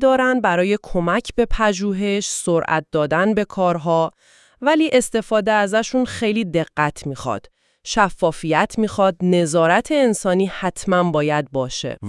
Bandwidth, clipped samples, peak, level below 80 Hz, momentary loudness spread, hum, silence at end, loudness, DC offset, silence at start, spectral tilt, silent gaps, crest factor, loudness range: 12 kHz; under 0.1%; -2 dBFS; -38 dBFS; 7 LU; none; 0 s; -19 LUFS; under 0.1%; 0 s; -5 dB/octave; none; 18 dB; 2 LU